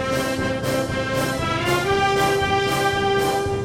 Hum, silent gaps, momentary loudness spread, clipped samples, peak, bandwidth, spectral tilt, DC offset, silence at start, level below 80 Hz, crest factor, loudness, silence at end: none; none; 4 LU; under 0.1%; -8 dBFS; 17 kHz; -4.5 dB/octave; under 0.1%; 0 s; -40 dBFS; 14 dB; -21 LUFS; 0 s